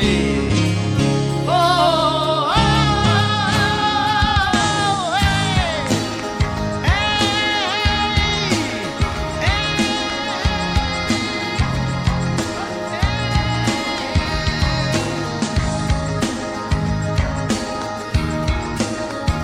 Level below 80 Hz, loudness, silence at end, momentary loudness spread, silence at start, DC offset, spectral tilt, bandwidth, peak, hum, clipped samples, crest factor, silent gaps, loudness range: -28 dBFS; -19 LUFS; 0 s; 6 LU; 0 s; under 0.1%; -4.5 dB/octave; 15 kHz; -2 dBFS; none; under 0.1%; 16 dB; none; 5 LU